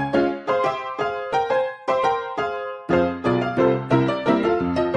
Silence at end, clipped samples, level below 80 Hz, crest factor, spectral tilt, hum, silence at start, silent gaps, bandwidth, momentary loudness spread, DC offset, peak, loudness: 0 s; under 0.1%; -54 dBFS; 16 dB; -7.5 dB/octave; none; 0 s; none; 9.4 kHz; 6 LU; under 0.1%; -4 dBFS; -22 LUFS